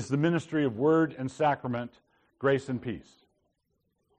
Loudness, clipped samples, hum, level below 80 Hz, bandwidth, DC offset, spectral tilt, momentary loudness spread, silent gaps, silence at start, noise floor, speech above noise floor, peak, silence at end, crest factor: -29 LUFS; under 0.1%; none; -66 dBFS; 9.6 kHz; under 0.1%; -7 dB/octave; 12 LU; none; 0 s; -77 dBFS; 49 dB; -14 dBFS; 1.15 s; 16 dB